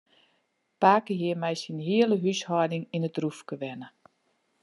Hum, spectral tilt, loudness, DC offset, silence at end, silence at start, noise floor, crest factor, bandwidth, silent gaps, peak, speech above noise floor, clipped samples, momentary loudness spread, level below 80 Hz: none; -6 dB/octave; -27 LUFS; under 0.1%; 0.75 s; 0.8 s; -73 dBFS; 22 dB; 11.5 kHz; none; -6 dBFS; 47 dB; under 0.1%; 14 LU; -82 dBFS